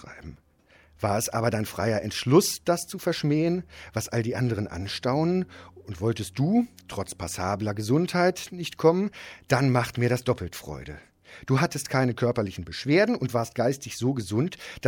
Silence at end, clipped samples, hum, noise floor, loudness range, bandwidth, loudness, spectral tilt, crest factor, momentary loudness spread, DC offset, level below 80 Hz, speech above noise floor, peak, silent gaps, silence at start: 0 s; under 0.1%; none; -59 dBFS; 2 LU; 17.5 kHz; -26 LUFS; -5.5 dB/octave; 20 dB; 13 LU; under 0.1%; -54 dBFS; 33 dB; -6 dBFS; none; 0 s